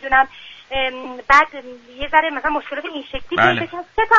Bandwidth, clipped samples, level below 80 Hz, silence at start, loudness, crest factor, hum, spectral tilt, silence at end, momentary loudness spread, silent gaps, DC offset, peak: 7.6 kHz; under 0.1%; -42 dBFS; 0.05 s; -18 LUFS; 18 dB; none; -4.5 dB/octave; 0 s; 17 LU; none; under 0.1%; 0 dBFS